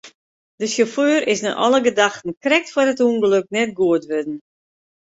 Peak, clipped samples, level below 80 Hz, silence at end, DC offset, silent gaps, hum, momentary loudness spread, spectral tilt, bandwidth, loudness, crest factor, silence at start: -2 dBFS; under 0.1%; -64 dBFS; 0.75 s; under 0.1%; 0.15-0.58 s, 2.37-2.41 s; none; 9 LU; -3.5 dB/octave; 8 kHz; -18 LUFS; 18 dB; 0.05 s